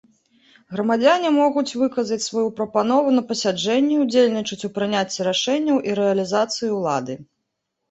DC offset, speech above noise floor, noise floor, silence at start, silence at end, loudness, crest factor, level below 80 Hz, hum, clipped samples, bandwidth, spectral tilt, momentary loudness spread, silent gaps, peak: under 0.1%; 58 dB; -77 dBFS; 0.7 s; 0.65 s; -20 LUFS; 16 dB; -66 dBFS; none; under 0.1%; 8.2 kHz; -4.5 dB/octave; 8 LU; none; -4 dBFS